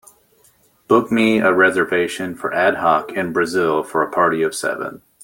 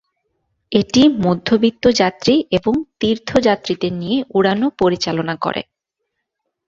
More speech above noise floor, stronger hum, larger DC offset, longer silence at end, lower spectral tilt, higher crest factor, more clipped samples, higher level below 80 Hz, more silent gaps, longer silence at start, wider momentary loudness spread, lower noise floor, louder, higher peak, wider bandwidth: second, 39 dB vs 60 dB; neither; neither; second, 0.25 s vs 1.05 s; about the same, -5 dB/octave vs -5.5 dB/octave; about the same, 16 dB vs 16 dB; neither; second, -60 dBFS vs -48 dBFS; neither; first, 0.9 s vs 0.7 s; about the same, 8 LU vs 7 LU; second, -56 dBFS vs -76 dBFS; about the same, -17 LUFS vs -17 LUFS; about the same, -2 dBFS vs 0 dBFS; first, 17 kHz vs 7.8 kHz